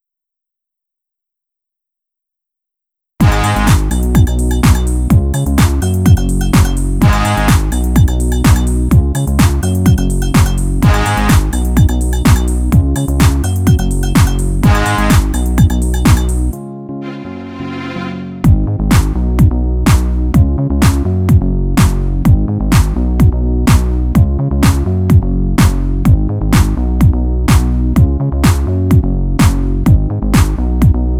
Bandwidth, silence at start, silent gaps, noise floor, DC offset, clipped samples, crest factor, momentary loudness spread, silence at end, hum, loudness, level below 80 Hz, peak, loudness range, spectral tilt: 16.5 kHz; 3.2 s; none; -81 dBFS; under 0.1%; under 0.1%; 10 dB; 3 LU; 0 s; none; -12 LUFS; -16 dBFS; 0 dBFS; 3 LU; -6 dB/octave